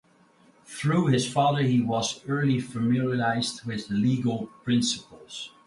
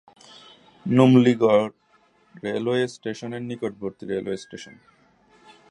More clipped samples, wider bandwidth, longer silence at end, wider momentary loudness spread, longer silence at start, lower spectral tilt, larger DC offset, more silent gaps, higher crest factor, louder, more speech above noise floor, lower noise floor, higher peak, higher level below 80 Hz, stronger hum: neither; about the same, 11.5 kHz vs 10.5 kHz; second, 0.2 s vs 1.05 s; second, 11 LU vs 19 LU; second, 0.7 s vs 0.85 s; second, -5.5 dB/octave vs -7 dB/octave; neither; neither; second, 16 dB vs 22 dB; second, -26 LUFS vs -22 LUFS; second, 34 dB vs 39 dB; about the same, -59 dBFS vs -61 dBFS; second, -10 dBFS vs -2 dBFS; about the same, -62 dBFS vs -66 dBFS; neither